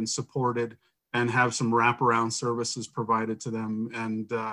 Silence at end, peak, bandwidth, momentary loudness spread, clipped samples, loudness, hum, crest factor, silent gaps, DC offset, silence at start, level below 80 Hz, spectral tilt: 0 s; -10 dBFS; 11.5 kHz; 9 LU; under 0.1%; -27 LUFS; none; 18 dB; none; under 0.1%; 0 s; -70 dBFS; -4.5 dB/octave